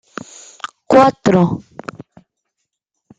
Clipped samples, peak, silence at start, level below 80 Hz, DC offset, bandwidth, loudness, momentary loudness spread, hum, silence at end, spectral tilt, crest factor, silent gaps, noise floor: under 0.1%; 0 dBFS; 0.9 s; -52 dBFS; under 0.1%; 9 kHz; -13 LUFS; 22 LU; none; 1.6 s; -6.5 dB/octave; 18 dB; none; -75 dBFS